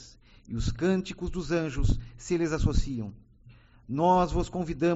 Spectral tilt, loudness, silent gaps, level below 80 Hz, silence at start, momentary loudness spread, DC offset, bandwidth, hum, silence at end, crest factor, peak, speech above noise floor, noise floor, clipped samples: -6.5 dB/octave; -29 LUFS; none; -34 dBFS; 0 s; 12 LU; under 0.1%; 8 kHz; none; 0 s; 18 dB; -10 dBFS; 28 dB; -55 dBFS; under 0.1%